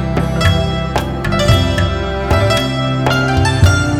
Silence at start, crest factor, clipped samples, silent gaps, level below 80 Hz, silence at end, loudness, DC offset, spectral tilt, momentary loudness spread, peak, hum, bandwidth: 0 s; 14 dB; under 0.1%; none; -24 dBFS; 0 s; -14 LUFS; 0.7%; -5.5 dB/octave; 6 LU; 0 dBFS; none; 15 kHz